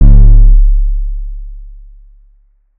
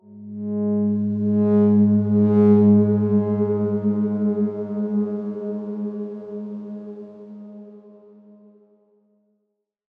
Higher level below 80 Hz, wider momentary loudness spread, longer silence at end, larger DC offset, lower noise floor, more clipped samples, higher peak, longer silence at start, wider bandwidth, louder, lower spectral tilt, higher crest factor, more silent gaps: first, -8 dBFS vs -76 dBFS; about the same, 22 LU vs 21 LU; second, 1.1 s vs 2.2 s; neither; second, -48 dBFS vs -76 dBFS; first, 10% vs under 0.1%; first, 0 dBFS vs -6 dBFS; about the same, 0 s vs 0.1 s; second, 1 kHz vs 2.4 kHz; first, -11 LUFS vs -20 LUFS; about the same, -12.5 dB/octave vs -13 dB/octave; second, 8 dB vs 16 dB; neither